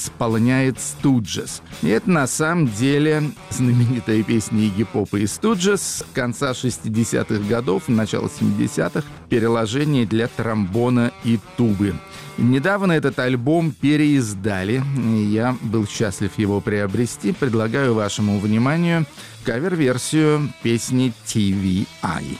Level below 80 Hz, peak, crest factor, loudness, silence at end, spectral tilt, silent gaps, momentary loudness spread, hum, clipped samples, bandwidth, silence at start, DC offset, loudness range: -50 dBFS; -8 dBFS; 12 dB; -20 LUFS; 0 s; -6 dB/octave; none; 5 LU; none; under 0.1%; 15.5 kHz; 0 s; under 0.1%; 2 LU